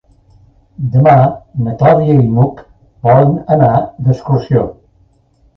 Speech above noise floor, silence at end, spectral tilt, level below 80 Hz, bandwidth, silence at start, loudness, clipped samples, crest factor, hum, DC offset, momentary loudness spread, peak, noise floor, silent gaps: 41 dB; 0.85 s; -10.5 dB/octave; -40 dBFS; 5.8 kHz; 0.8 s; -12 LUFS; under 0.1%; 12 dB; none; under 0.1%; 10 LU; 0 dBFS; -52 dBFS; none